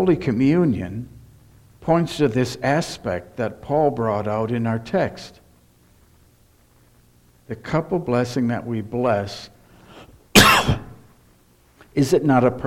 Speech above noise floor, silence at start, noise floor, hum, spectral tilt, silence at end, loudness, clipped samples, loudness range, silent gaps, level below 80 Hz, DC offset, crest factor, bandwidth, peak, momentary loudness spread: 35 dB; 0 s; -56 dBFS; none; -5 dB/octave; 0 s; -20 LUFS; under 0.1%; 9 LU; none; -44 dBFS; under 0.1%; 22 dB; 17 kHz; 0 dBFS; 16 LU